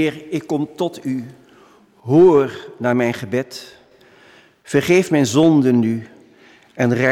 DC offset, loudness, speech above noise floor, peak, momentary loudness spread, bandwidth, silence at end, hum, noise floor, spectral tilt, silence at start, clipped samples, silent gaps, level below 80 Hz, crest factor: under 0.1%; -17 LUFS; 33 dB; -4 dBFS; 15 LU; 14.5 kHz; 0 s; none; -50 dBFS; -6 dB/octave; 0 s; under 0.1%; none; -60 dBFS; 14 dB